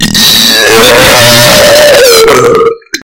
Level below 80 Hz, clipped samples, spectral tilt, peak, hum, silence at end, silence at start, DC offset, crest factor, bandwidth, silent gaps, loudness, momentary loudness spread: -30 dBFS; 20%; -2 dB/octave; 0 dBFS; none; 0.1 s; 0 s; under 0.1%; 4 dB; over 20 kHz; none; -2 LUFS; 4 LU